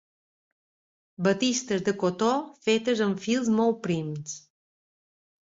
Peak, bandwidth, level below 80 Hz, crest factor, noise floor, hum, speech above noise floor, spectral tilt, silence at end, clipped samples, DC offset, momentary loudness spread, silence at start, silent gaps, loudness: -10 dBFS; 7.8 kHz; -68 dBFS; 18 dB; under -90 dBFS; none; over 64 dB; -4.5 dB/octave; 1.2 s; under 0.1%; under 0.1%; 9 LU; 1.2 s; none; -26 LUFS